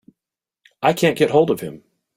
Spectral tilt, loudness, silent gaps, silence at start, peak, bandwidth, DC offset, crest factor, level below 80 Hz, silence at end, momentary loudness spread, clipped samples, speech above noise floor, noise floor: -5.5 dB/octave; -18 LUFS; none; 0.8 s; -2 dBFS; 16 kHz; under 0.1%; 18 dB; -60 dBFS; 0.4 s; 9 LU; under 0.1%; 70 dB; -88 dBFS